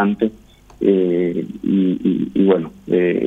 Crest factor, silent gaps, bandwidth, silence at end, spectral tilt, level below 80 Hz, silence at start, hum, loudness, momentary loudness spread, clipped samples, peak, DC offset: 16 dB; none; 6.8 kHz; 0 s; -9.5 dB/octave; -52 dBFS; 0 s; none; -18 LUFS; 6 LU; under 0.1%; -2 dBFS; under 0.1%